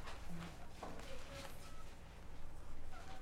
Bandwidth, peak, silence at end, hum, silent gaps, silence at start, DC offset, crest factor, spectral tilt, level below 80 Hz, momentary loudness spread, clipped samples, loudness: 13.5 kHz; -34 dBFS; 0 s; none; none; 0 s; under 0.1%; 10 dB; -4.5 dB/octave; -52 dBFS; 6 LU; under 0.1%; -54 LUFS